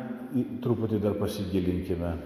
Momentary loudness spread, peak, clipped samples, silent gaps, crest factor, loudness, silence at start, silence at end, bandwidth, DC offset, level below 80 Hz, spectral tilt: 4 LU; -14 dBFS; under 0.1%; none; 16 dB; -29 LUFS; 0 s; 0 s; 15.5 kHz; under 0.1%; -44 dBFS; -8 dB/octave